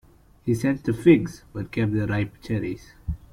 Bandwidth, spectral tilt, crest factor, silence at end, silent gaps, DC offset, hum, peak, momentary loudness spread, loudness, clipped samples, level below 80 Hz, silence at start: 14 kHz; -8 dB/octave; 20 dB; 0.15 s; none; under 0.1%; none; -4 dBFS; 17 LU; -24 LUFS; under 0.1%; -44 dBFS; 0.45 s